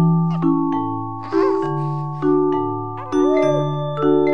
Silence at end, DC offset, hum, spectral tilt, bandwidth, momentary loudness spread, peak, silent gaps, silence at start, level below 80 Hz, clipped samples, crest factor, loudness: 0 s; 1%; none; -9 dB/octave; 6.4 kHz; 7 LU; -6 dBFS; none; 0 s; -60 dBFS; under 0.1%; 12 dB; -20 LUFS